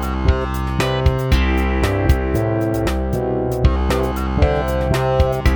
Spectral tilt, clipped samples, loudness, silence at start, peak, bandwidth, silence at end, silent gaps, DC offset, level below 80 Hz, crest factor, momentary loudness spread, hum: -7 dB/octave; under 0.1%; -18 LUFS; 0 s; -2 dBFS; over 20 kHz; 0 s; none; under 0.1%; -20 dBFS; 16 dB; 3 LU; none